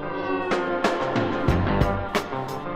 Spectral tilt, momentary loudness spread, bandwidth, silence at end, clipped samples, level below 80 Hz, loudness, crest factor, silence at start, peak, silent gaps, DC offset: -6.5 dB/octave; 5 LU; 16 kHz; 0 s; under 0.1%; -36 dBFS; -24 LUFS; 18 dB; 0 s; -6 dBFS; none; 0.6%